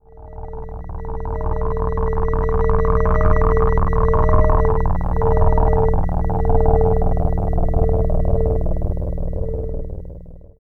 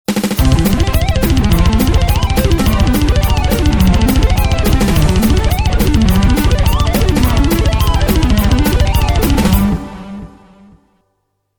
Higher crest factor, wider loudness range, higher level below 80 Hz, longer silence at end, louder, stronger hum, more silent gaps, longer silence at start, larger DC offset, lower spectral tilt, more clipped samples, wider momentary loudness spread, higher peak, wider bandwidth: about the same, 16 dB vs 12 dB; about the same, 4 LU vs 2 LU; about the same, -18 dBFS vs -14 dBFS; second, 0.25 s vs 1.3 s; second, -20 LUFS vs -13 LUFS; neither; neither; about the same, 0.15 s vs 0.1 s; first, 0.2% vs under 0.1%; first, -11 dB/octave vs -6 dB/octave; neither; first, 16 LU vs 2 LU; about the same, 0 dBFS vs 0 dBFS; second, 2.4 kHz vs over 20 kHz